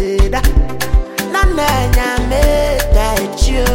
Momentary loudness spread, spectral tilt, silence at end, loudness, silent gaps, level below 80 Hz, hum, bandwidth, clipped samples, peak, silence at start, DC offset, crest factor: 4 LU; -5 dB/octave; 0 s; -15 LUFS; none; -14 dBFS; none; 17 kHz; under 0.1%; 0 dBFS; 0 s; under 0.1%; 12 dB